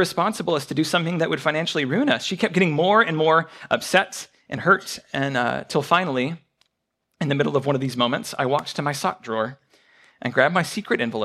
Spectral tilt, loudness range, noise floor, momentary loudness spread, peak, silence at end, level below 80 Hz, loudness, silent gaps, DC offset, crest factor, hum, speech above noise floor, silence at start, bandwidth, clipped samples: -5 dB/octave; 4 LU; -77 dBFS; 8 LU; -2 dBFS; 0 s; -66 dBFS; -22 LUFS; none; under 0.1%; 20 dB; none; 55 dB; 0 s; 14.5 kHz; under 0.1%